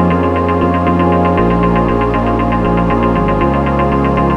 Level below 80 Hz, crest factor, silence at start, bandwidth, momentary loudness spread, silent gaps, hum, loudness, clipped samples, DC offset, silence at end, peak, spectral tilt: -24 dBFS; 12 dB; 0 s; 6.6 kHz; 2 LU; none; none; -13 LUFS; under 0.1%; under 0.1%; 0 s; 0 dBFS; -9 dB/octave